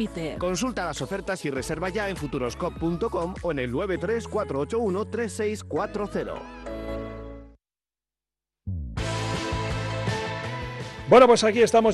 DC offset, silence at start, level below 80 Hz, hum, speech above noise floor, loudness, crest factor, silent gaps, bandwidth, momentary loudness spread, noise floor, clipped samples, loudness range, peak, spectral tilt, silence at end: under 0.1%; 0 s; -44 dBFS; none; over 66 dB; -26 LUFS; 22 dB; none; 12.5 kHz; 16 LU; under -90 dBFS; under 0.1%; 11 LU; -4 dBFS; -5 dB/octave; 0 s